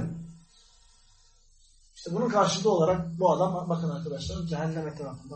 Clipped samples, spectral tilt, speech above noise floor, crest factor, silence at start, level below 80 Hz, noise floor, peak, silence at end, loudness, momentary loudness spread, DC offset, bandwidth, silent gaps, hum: under 0.1%; -6 dB/octave; 32 dB; 20 dB; 0 s; -54 dBFS; -59 dBFS; -10 dBFS; 0 s; -28 LUFS; 14 LU; under 0.1%; 8.4 kHz; none; none